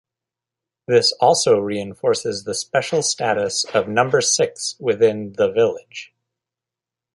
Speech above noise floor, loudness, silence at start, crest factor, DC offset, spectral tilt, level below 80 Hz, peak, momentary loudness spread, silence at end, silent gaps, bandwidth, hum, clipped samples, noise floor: 69 dB; -19 LUFS; 0.9 s; 18 dB; under 0.1%; -3 dB/octave; -62 dBFS; -2 dBFS; 8 LU; 1.1 s; none; 11.5 kHz; none; under 0.1%; -87 dBFS